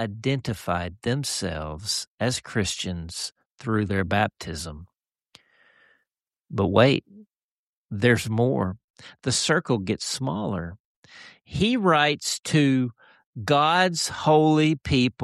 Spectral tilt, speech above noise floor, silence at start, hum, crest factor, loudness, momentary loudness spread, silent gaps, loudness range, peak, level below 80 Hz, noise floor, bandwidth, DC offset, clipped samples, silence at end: -4.5 dB/octave; over 66 dB; 0 s; none; 22 dB; -24 LUFS; 14 LU; 2.07-2.18 s, 3.46-3.56 s, 7.43-7.89 s, 8.84-8.94 s, 10.80-11.03 s, 13.26-13.33 s; 7 LU; -4 dBFS; -50 dBFS; under -90 dBFS; 13 kHz; under 0.1%; under 0.1%; 0 s